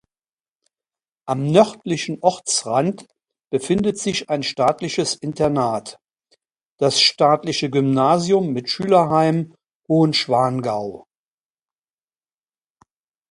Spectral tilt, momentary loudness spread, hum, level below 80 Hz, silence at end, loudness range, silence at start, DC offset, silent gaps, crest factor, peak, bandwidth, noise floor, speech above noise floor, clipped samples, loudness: -4.5 dB/octave; 11 LU; none; -58 dBFS; 2.3 s; 5 LU; 1.25 s; under 0.1%; 6.66-6.76 s, 9.75-9.80 s; 20 dB; 0 dBFS; 11.5 kHz; under -90 dBFS; over 71 dB; under 0.1%; -19 LUFS